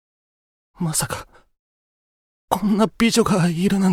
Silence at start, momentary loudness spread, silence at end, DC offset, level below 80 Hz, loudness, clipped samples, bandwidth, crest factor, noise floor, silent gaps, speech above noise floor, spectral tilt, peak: 0.8 s; 11 LU; 0 s; under 0.1%; -48 dBFS; -20 LUFS; under 0.1%; 16.5 kHz; 20 dB; under -90 dBFS; 1.59-2.48 s; over 71 dB; -5 dB/octave; -2 dBFS